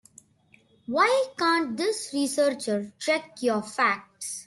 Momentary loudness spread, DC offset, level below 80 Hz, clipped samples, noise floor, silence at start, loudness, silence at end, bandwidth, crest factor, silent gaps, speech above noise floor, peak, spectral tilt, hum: 8 LU; under 0.1%; -74 dBFS; under 0.1%; -61 dBFS; 0.9 s; -26 LUFS; 0.05 s; 12.5 kHz; 18 dB; none; 35 dB; -8 dBFS; -3 dB/octave; none